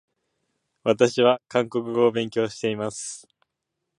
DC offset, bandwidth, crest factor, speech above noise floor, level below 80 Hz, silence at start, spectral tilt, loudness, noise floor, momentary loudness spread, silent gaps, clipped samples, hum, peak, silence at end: under 0.1%; 11.5 kHz; 20 dB; 59 dB; -68 dBFS; 0.85 s; -4.5 dB/octave; -23 LUFS; -81 dBFS; 13 LU; none; under 0.1%; none; -4 dBFS; 0.8 s